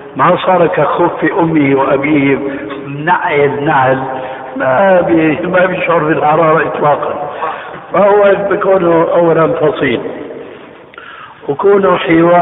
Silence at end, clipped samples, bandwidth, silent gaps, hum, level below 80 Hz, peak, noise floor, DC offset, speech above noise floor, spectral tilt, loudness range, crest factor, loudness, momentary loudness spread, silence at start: 0 s; under 0.1%; 4 kHz; none; none; -48 dBFS; 0 dBFS; -33 dBFS; under 0.1%; 23 dB; -11.5 dB/octave; 2 LU; 10 dB; -11 LUFS; 13 LU; 0 s